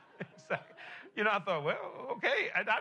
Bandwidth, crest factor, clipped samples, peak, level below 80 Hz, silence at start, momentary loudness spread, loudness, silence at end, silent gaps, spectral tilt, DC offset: 10.5 kHz; 20 dB; under 0.1%; -16 dBFS; -88 dBFS; 0.15 s; 17 LU; -34 LUFS; 0 s; none; -5 dB/octave; under 0.1%